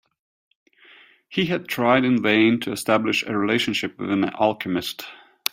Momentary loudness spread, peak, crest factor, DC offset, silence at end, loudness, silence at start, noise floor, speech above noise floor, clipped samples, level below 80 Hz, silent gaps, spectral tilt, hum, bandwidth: 11 LU; 0 dBFS; 22 dB; under 0.1%; 0.35 s; -21 LUFS; 1.3 s; -52 dBFS; 30 dB; under 0.1%; -62 dBFS; none; -4.5 dB/octave; none; 16 kHz